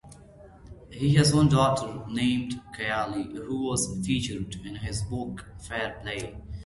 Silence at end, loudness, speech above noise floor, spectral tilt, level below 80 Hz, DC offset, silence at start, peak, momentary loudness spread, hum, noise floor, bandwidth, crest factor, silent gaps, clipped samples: 0 s; -27 LUFS; 23 dB; -5 dB/octave; -46 dBFS; under 0.1%; 0.05 s; -10 dBFS; 15 LU; none; -50 dBFS; 12 kHz; 18 dB; none; under 0.1%